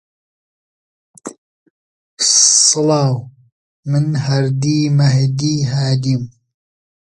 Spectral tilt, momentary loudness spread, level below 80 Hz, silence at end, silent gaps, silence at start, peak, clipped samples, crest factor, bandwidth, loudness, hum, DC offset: -4 dB/octave; 23 LU; -54 dBFS; 0.7 s; 1.38-2.17 s, 3.52-3.83 s; 1.25 s; 0 dBFS; under 0.1%; 16 dB; 11.5 kHz; -14 LUFS; none; under 0.1%